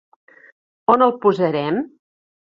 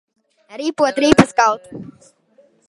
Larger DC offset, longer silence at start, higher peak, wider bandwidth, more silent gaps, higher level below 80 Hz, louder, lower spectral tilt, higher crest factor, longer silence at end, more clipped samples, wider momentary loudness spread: neither; first, 0.9 s vs 0.55 s; about the same, -2 dBFS vs 0 dBFS; second, 7.4 kHz vs 11.5 kHz; neither; second, -62 dBFS vs -46 dBFS; about the same, -18 LUFS vs -16 LUFS; first, -8 dB/octave vs -5 dB/octave; about the same, 20 dB vs 18 dB; second, 0.65 s vs 0.85 s; neither; second, 10 LU vs 23 LU